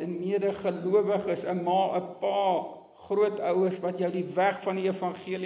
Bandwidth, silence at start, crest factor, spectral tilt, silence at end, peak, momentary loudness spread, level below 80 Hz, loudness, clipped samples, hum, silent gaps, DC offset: 4 kHz; 0 s; 16 dB; -10.5 dB/octave; 0 s; -12 dBFS; 5 LU; -72 dBFS; -28 LUFS; under 0.1%; none; none; under 0.1%